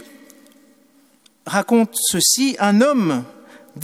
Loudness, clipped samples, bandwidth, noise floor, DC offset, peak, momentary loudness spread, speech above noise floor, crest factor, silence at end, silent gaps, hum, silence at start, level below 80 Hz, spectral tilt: -17 LUFS; under 0.1%; 16 kHz; -55 dBFS; under 0.1%; -2 dBFS; 11 LU; 38 dB; 18 dB; 0 s; none; none; 1.45 s; -62 dBFS; -3.5 dB/octave